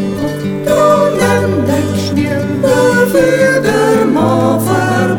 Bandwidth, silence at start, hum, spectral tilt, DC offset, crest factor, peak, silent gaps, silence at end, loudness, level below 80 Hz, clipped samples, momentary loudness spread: 18 kHz; 0 s; none; -6 dB/octave; under 0.1%; 12 dB; 0 dBFS; none; 0 s; -11 LUFS; -44 dBFS; under 0.1%; 5 LU